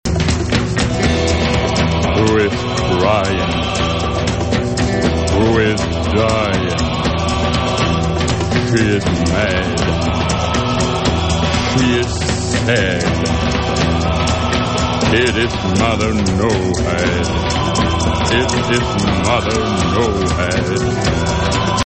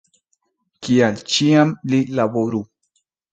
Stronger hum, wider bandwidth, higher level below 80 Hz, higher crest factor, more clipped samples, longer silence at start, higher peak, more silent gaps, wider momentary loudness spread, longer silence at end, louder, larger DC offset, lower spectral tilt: neither; about the same, 8.8 kHz vs 9.2 kHz; first, -26 dBFS vs -60 dBFS; about the same, 14 dB vs 18 dB; neither; second, 0.05 s vs 0.8 s; about the same, -2 dBFS vs -2 dBFS; neither; second, 3 LU vs 12 LU; second, 0 s vs 0.7 s; about the same, -16 LUFS vs -18 LUFS; neither; about the same, -5 dB/octave vs -5.5 dB/octave